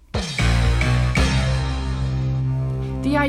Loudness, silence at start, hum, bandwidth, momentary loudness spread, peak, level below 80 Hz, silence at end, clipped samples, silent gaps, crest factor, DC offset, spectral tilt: -21 LUFS; 0.15 s; none; 11.5 kHz; 6 LU; -6 dBFS; -24 dBFS; 0 s; under 0.1%; none; 14 dB; under 0.1%; -6 dB/octave